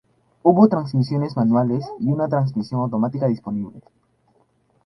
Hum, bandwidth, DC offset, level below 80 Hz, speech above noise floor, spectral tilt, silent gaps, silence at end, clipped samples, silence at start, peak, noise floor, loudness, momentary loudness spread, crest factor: none; 6 kHz; under 0.1%; -58 dBFS; 43 dB; -10 dB/octave; none; 1.05 s; under 0.1%; 0.45 s; 0 dBFS; -62 dBFS; -20 LUFS; 9 LU; 20 dB